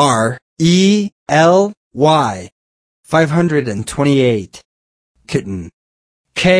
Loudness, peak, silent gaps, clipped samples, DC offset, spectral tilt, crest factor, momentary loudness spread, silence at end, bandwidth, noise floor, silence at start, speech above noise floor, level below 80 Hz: -14 LUFS; 0 dBFS; 0.42-0.56 s, 1.12-1.26 s, 1.77-1.91 s, 2.52-3.03 s, 4.65-5.15 s, 5.73-6.24 s; under 0.1%; under 0.1%; -5.5 dB/octave; 14 dB; 12 LU; 0 s; 11 kHz; under -90 dBFS; 0 s; over 77 dB; -48 dBFS